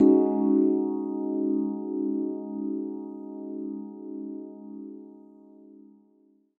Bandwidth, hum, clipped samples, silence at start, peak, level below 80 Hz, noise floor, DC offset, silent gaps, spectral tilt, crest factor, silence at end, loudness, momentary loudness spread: 2.1 kHz; none; under 0.1%; 0 s; -8 dBFS; -76 dBFS; -63 dBFS; under 0.1%; none; -12.5 dB/octave; 20 dB; 0.85 s; -28 LUFS; 19 LU